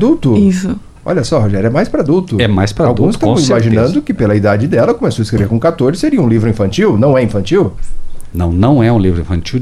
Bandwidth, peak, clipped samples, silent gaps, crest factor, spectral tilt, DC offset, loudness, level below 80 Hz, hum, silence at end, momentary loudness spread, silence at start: 12.5 kHz; 0 dBFS; under 0.1%; none; 10 dB; -7 dB/octave; under 0.1%; -12 LUFS; -28 dBFS; none; 0 s; 7 LU; 0 s